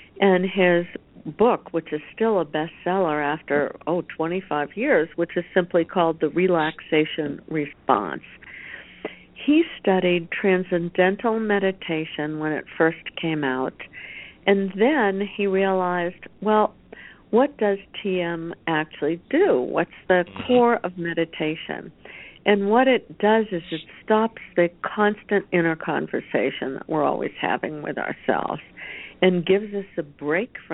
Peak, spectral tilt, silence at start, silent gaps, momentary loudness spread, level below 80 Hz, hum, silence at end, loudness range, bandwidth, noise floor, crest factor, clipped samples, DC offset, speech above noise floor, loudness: -2 dBFS; -10.5 dB/octave; 0 s; none; 13 LU; -60 dBFS; none; 0 s; 3 LU; 4.1 kHz; -45 dBFS; 20 dB; under 0.1%; under 0.1%; 23 dB; -23 LUFS